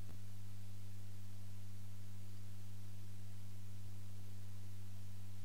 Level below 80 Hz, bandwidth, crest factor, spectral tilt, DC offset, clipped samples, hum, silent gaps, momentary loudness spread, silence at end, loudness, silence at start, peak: -72 dBFS; 16 kHz; 10 dB; -5.5 dB/octave; 1%; under 0.1%; 50 Hz at -55 dBFS; none; 1 LU; 0 s; -54 LUFS; 0 s; -36 dBFS